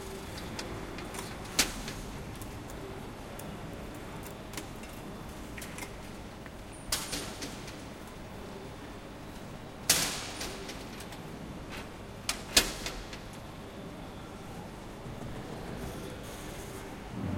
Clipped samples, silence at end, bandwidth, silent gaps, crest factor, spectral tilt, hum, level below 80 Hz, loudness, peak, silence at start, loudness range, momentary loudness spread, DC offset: under 0.1%; 0 s; 16.5 kHz; none; 32 dB; -2.5 dB/octave; none; -50 dBFS; -37 LUFS; -6 dBFS; 0 s; 9 LU; 15 LU; under 0.1%